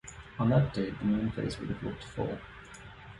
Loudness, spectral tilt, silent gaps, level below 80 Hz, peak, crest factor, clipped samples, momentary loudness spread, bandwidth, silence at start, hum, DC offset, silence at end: -32 LUFS; -7.5 dB/octave; none; -52 dBFS; -14 dBFS; 18 dB; under 0.1%; 21 LU; 11 kHz; 0.05 s; none; under 0.1%; 0 s